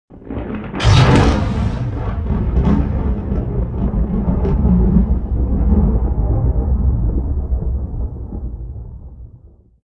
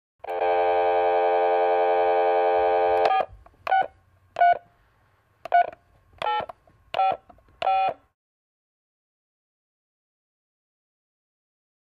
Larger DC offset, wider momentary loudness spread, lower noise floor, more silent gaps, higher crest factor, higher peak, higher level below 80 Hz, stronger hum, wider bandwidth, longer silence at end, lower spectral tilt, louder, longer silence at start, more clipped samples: neither; first, 15 LU vs 11 LU; second, -44 dBFS vs -63 dBFS; neither; about the same, 16 dB vs 20 dB; first, 0 dBFS vs -6 dBFS; first, -20 dBFS vs -62 dBFS; neither; first, 9.6 kHz vs 6 kHz; second, 0.4 s vs 4 s; first, -7.5 dB/octave vs -5 dB/octave; first, -17 LUFS vs -23 LUFS; second, 0.1 s vs 0.25 s; neither